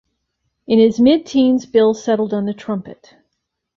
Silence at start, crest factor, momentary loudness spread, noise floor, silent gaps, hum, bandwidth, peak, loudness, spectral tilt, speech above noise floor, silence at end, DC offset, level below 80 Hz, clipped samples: 0.7 s; 14 dB; 12 LU; -75 dBFS; none; none; 7.4 kHz; -2 dBFS; -16 LUFS; -6.5 dB/octave; 60 dB; 0.85 s; under 0.1%; -56 dBFS; under 0.1%